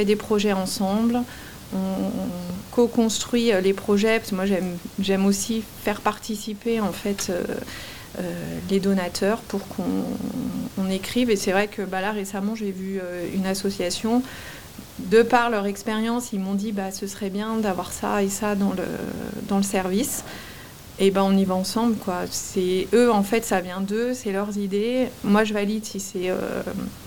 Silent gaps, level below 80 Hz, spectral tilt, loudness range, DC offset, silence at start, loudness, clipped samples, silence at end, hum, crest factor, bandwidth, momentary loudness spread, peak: none; -52 dBFS; -5 dB/octave; 4 LU; 0.3%; 0 s; -24 LUFS; under 0.1%; 0 s; none; 20 dB; 18 kHz; 10 LU; -4 dBFS